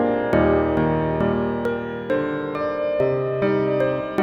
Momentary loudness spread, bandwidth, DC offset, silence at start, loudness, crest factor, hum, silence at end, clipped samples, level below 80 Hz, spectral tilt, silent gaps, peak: 6 LU; 6.4 kHz; under 0.1%; 0 s; -22 LUFS; 16 dB; none; 0 s; under 0.1%; -42 dBFS; -9 dB/octave; none; -4 dBFS